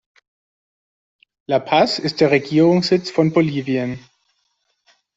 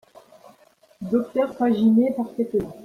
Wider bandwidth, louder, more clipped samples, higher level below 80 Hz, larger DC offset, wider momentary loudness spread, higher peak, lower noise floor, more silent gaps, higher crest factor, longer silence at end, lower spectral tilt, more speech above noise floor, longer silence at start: first, 8 kHz vs 6.2 kHz; first, -17 LUFS vs -22 LUFS; neither; about the same, -60 dBFS vs -58 dBFS; neither; about the same, 8 LU vs 8 LU; first, -2 dBFS vs -8 dBFS; first, -69 dBFS vs -56 dBFS; neither; about the same, 18 dB vs 14 dB; first, 1.2 s vs 0 s; second, -6.5 dB/octave vs -8.5 dB/octave; first, 52 dB vs 35 dB; first, 1.5 s vs 1 s